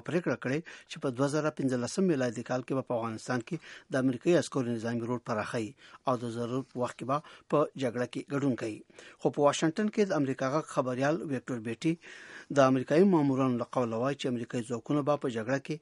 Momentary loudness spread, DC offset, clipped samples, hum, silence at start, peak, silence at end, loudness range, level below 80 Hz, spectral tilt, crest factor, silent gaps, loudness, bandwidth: 10 LU; under 0.1%; under 0.1%; none; 0.05 s; -10 dBFS; 0.05 s; 4 LU; -74 dBFS; -6 dB/octave; 22 dB; none; -31 LUFS; 11.5 kHz